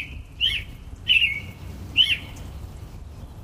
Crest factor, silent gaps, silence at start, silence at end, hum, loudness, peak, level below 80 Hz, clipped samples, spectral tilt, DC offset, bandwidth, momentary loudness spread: 20 dB; none; 0 s; 0 s; none; -21 LUFS; -8 dBFS; -40 dBFS; under 0.1%; -2.5 dB/octave; under 0.1%; 15.5 kHz; 23 LU